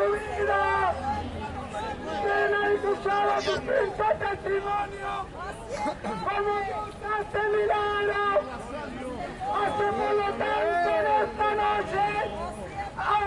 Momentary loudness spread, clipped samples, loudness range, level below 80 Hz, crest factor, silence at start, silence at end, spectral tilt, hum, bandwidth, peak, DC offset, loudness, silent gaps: 11 LU; under 0.1%; 3 LU; -48 dBFS; 14 dB; 0 s; 0 s; -5 dB/octave; none; 11.5 kHz; -12 dBFS; under 0.1%; -27 LUFS; none